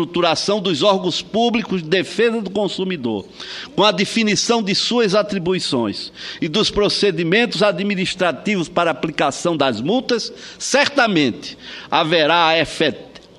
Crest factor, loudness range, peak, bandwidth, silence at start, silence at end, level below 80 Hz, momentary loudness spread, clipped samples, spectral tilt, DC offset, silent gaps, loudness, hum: 18 dB; 2 LU; 0 dBFS; 12 kHz; 0 s; 0.2 s; -50 dBFS; 10 LU; under 0.1%; -4 dB/octave; under 0.1%; none; -18 LUFS; none